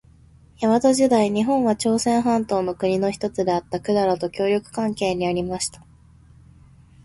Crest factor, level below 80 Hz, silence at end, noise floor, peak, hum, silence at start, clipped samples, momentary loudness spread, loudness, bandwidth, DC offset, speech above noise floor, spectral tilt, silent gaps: 16 dB; -52 dBFS; 1.3 s; -51 dBFS; -6 dBFS; none; 0.6 s; under 0.1%; 7 LU; -21 LUFS; 11.5 kHz; under 0.1%; 30 dB; -5 dB/octave; none